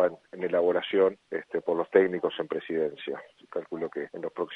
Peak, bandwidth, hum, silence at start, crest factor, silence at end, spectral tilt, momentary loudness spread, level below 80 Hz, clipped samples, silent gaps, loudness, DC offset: -6 dBFS; 4.6 kHz; none; 0 s; 22 dB; 0 s; -7.5 dB/octave; 14 LU; -74 dBFS; under 0.1%; none; -29 LUFS; under 0.1%